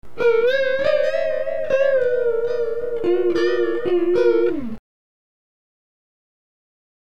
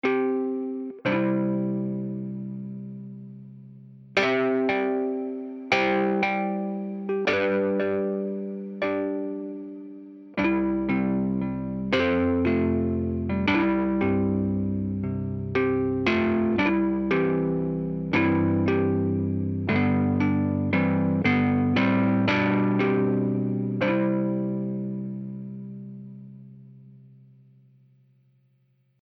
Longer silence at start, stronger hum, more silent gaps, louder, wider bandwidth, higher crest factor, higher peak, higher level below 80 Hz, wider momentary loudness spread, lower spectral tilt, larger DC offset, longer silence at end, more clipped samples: about the same, 0 s vs 0.05 s; neither; neither; first, -20 LUFS vs -25 LUFS; about the same, 7 kHz vs 6.4 kHz; about the same, 14 dB vs 18 dB; about the same, -6 dBFS vs -6 dBFS; about the same, -54 dBFS vs -52 dBFS; second, 7 LU vs 14 LU; second, -6 dB/octave vs -8 dB/octave; first, 4% vs under 0.1%; first, 2.25 s vs 2.05 s; neither